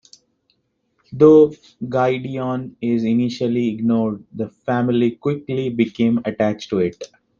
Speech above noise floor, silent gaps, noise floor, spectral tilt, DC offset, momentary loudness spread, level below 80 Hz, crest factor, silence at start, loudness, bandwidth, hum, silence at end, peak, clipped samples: 49 dB; none; -67 dBFS; -8 dB/octave; under 0.1%; 12 LU; -60 dBFS; 18 dB; 1.1 s; -19 LUFS; 7.2 kHz; none; 0.35 s; -2 dBFS; under 0.1%